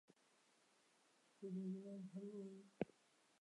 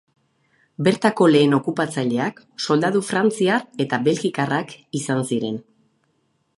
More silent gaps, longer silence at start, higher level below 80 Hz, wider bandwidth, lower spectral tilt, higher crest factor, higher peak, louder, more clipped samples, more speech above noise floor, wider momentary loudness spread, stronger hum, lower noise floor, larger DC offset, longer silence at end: neither; second, 0.1 s vs 0.8 s; second, under -90 dBFS vs -68 dBFS; about the same, 11 kHz vs 11.5 kHz; first, -8 dB/octave vs -5.5 dB/octave; first, 28 dB vs 20 dB; second, -26 dBFS vs -2 dBFS; second, -52 LUFS vs -20 LUFS; neither; second, 27 dB vs 48 dB; second, 7 LU vs 12 LU; neither; first, -78 dBFS vs -68 dBFS; neither; second, 0.5 s vs 0.95 s